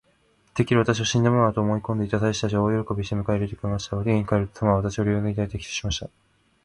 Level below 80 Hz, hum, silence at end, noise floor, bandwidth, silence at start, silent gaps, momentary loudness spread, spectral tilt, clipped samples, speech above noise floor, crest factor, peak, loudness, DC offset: -44 dBFS; none; 0.6 s; -63 dBFS; 11 kHz; 0.55 s; none; 8 LU; -6 dB/octave; under 0.1%; 40 dB; 18 dB; -6 dBFS; -24 LUFS; under 0.1%